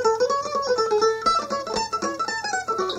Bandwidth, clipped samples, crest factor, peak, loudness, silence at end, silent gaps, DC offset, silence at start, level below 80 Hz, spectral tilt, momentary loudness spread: 13 kHz; under 0.1%; 16 dB; -8 dBFS; -23 LUFS; 0 s; none; under 0.1%; 0 s; -56 dBFS; -2.5 dB/octave; 6 LU